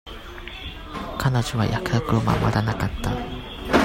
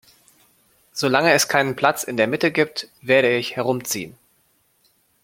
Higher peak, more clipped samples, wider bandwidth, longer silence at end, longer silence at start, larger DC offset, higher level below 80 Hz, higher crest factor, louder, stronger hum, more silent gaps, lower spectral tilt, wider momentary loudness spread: second, -4 dBFS vs 0 dBFS; neither; about the same, 16.5 kHz vs 16.5 kHz; second, 0 s vs 1.15 s; second, 0.05 s vs 0.95 s; neither; first, -36 dBFS vs -66 dBFS; about the same, 20 dB vs 22 dB; second, -24 LUFS vs -20 LUFS; neither; neither; first, -6 dB/octave vs -3.5 dB/octave; first, 14 LU vs 11 LU